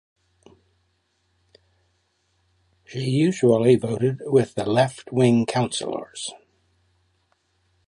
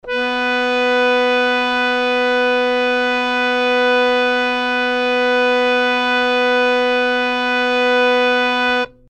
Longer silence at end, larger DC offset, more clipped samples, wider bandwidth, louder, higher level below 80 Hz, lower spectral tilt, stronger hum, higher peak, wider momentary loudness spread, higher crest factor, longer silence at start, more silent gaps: first, 1.5 s vs 0.2 s; neither; neither; first, 11.5 kHz vs 9.4 kHz; second, -22 LUFS vs -15 LUFS; second, -62 dBFS vs -52 dBFS; first, -6 dB/octave vs -2.5 dB/octave; neither; about the same, -4 dBFS vs -4 dBFS; first, 13 LU vs 3 LU; first, 20 dB vs 12 dB; first, 2.9 s vs 0.05 s; neither